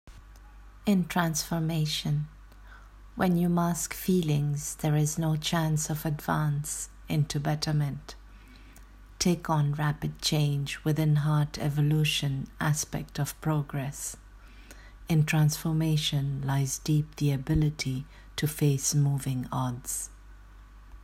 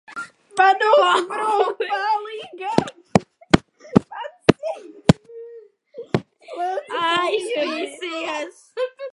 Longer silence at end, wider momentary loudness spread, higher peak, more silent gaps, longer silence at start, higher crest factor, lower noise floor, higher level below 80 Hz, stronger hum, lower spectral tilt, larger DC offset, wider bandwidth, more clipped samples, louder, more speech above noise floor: about the same, 0 s vs 0.05 s; second, 8 LU vs 17 LU; second, -10 dBFS vs 0 dBFS; neither; about the same, 0.05 s vs 0.1 s; about the same, 18 dB vs 22 dB; first, -50 dBFS vs -44 dBFS; about the same, -48 dBFS vs -48 dBFS; neither; about the same, -5 dB/octave vs -5.5 dB/octave; neither; first, 16 kHz vs 11.5 kHz; neither; second, -28 LUFS vs -21 LUFS; about the same, 22 dB vs 23 dB